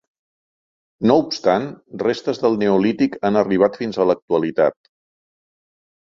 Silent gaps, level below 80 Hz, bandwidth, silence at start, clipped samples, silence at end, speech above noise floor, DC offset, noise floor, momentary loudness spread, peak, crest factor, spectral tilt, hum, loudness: 4.22-4.28 s; -58 dBFS; 7.4 kHz; 1 s; under 0.1%; 1.4 s; over 72 dB; under 0.1%; under -90 dBFS; 5 LU; -2 dBFS; 18 dB; -6.5 dB/octave; none; -19 LUFS